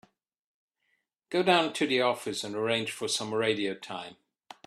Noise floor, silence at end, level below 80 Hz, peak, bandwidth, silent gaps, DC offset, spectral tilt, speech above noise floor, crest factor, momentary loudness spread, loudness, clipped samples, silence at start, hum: -77 dBFS; 0.55 s; -74 dBFS; -8 dBFS; 13.5 kHz; none; under 0.1%; -3.5 dB/octave; 48 dB; 22 dB; 14 LU; -28 LUFS; under 0.1%; 1.3 s; none